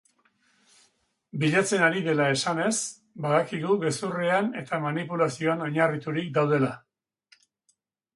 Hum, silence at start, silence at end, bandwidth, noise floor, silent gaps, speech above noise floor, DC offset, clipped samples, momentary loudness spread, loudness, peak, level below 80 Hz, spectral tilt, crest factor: none; 1.35 s; 1.35 s; 11.5 kHz; -73 dBFS; none; 47 dB; under 0.1%; under 0.1%; 7 LU; -26 LUFS; -6 dBFS; -70 dBFS; -5 dB/octave; 20 dB